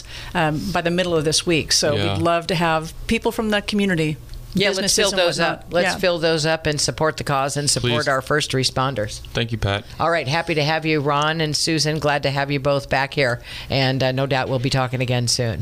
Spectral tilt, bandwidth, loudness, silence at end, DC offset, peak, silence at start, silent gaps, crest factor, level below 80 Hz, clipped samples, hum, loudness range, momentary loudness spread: -4 dB/octave; 15.5 kHz; -20 LUFS; 0 s; under 0.1%; -4 dBFS; 0 s; none; 16 dB; -42 dBFS; under 0.1%; none; 1 LU; 5 LU